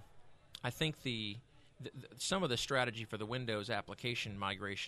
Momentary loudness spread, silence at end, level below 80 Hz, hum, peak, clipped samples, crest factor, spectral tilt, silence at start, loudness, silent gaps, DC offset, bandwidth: 16 LU; 0 s; -64 dBFS; none; -20 dBFS; under 0.1%; 20 dB; -4 dB/octave; 0 s; -38 LUFS; none; under 0.1%; 13.5 kHz